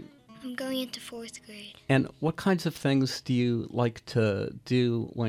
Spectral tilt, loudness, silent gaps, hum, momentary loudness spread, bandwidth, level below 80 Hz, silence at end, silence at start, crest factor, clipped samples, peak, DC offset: -6.5 dB/octave; -29 LUFS; none; none; 15 LU; 15.5 kHz; -62 dBFS; 0 s; 0 s; 16 dB; under 0.1%; -12 dBFS; under 0.1%